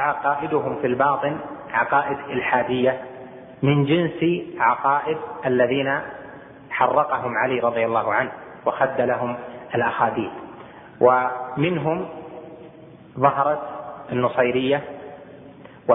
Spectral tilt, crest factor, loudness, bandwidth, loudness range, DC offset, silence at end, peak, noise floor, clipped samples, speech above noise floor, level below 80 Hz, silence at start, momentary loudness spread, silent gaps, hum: -10.5 dB/octave; 20 dB; -22 LUFS; 3.9 kHz; 2 LU; under 0.1%; 0 s; -2 dBFS; -44 dBFS; under 0.1%; 23 dB; -60 dBFS; 0 s; 19 LU; none; none